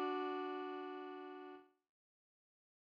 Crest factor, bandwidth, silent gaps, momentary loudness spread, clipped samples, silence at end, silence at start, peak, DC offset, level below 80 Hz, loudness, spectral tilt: 16 dB; 6.2 kHz; none; 14 LU; under 0.1%; 1.25 s; 0 s; -30 dBFS; under 0.1%; under -90 dBFS; -46 LUFS; -4.5 dB/octave